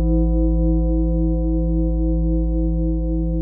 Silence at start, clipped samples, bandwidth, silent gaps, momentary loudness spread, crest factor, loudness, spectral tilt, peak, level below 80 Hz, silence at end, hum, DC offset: 0 s; under 0.1%; 1.1 kHz; none; 3 LU; 10 dB; -21 LUFS; -18.5 dB/octave; -8 dBFS; -20 dBFS; 0 s; none; under 0.1%